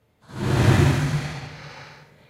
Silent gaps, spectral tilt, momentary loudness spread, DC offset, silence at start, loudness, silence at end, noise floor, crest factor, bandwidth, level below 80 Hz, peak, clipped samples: none; -6.5 dB/octave; 23 LU; under 0.1%; 0.3 s; -21 LUFS; 0.35 s; -46 dBFS; 18 dB; 14 kHz; -38 dBFS; -4 dBFS; under 0.1%